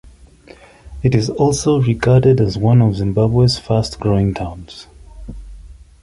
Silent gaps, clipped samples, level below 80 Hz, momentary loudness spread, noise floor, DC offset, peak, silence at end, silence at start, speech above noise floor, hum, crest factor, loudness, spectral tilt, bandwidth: none; under 0.1%; -36 dBFS; 22 LU; -43 dBFS; under 0.1%; -2 dBFS; 0.3 s; 0.85 s; 29 dB; none; 14 dB; -15 LUFS; -7 dB/octave; 11.5 kHz